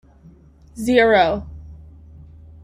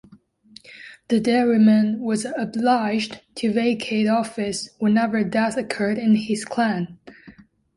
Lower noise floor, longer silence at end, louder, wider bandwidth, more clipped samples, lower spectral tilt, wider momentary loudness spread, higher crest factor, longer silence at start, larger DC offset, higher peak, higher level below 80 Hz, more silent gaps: second, -48 dBFS vs -52 dBFS; first, 0.85 s vs 0.45 s; first, -17 LUFS vs -21 LUFS; first, 15.5 kHz vs 11.5 kHz; neither; about the same, -5 dB/octave vs -5.5 dB/octave; first, 24 LU vs 10 LU; about the same, 20 dB vs 16 dB; about the same, 0.75 s vs 0.7 s; neither; first, -2 dBFS vs -6 dBFS; first, -44 dBFS vs -62 dBFS; neither